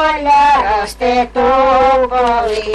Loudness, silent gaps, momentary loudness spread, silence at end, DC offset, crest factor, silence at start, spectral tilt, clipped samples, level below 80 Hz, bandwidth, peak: -12 LUFS; none; 6 LU; 0 s; under 0.1%; 8 dB; 0 s; -4 dB/octave; under 0.1%; -34 dBFS; 12.5 kHz; -4 dBFS